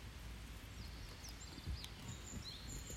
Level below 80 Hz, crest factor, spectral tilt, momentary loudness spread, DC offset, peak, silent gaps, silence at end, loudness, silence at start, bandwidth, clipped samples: -54 dBFS; 22 dB; -3.5 dB/octave; 4 LU; under 0.1%; -28 dBFS; none; 0 s; -51 LUFS; 0 s; 16 kHz; under 0.1%